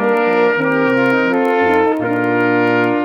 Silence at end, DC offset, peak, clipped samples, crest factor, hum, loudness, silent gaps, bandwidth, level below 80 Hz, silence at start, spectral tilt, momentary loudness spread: 0 s; under 0.1%; -2 dBFS; under 0.1%; 12 dB; none; -14 LUFS; none; 7 kHz; -58 dBFS; 0 s; -7.5 dB/octave; 2 LU